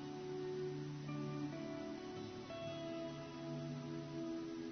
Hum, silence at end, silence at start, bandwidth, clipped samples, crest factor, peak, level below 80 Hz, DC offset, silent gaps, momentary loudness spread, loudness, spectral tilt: none; 0 s; 0 s; 6.4 kHz; under 0.1%; 12 dB; -34 dBFS; -74 dBFS; under 0.1%; none; 4 LU; -46 LUFS; -6 dB/octave